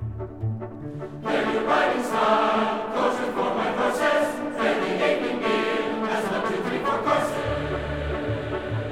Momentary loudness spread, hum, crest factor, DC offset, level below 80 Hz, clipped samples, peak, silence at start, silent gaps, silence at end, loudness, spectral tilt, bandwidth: 9 LU; none; 18 dB; 0.2%; -44 dBFS; under 0.1%; -6 dBFS; 0 s; none; 0 s; -24 LUFS; -5.5 dB/octave; 16.5 kHz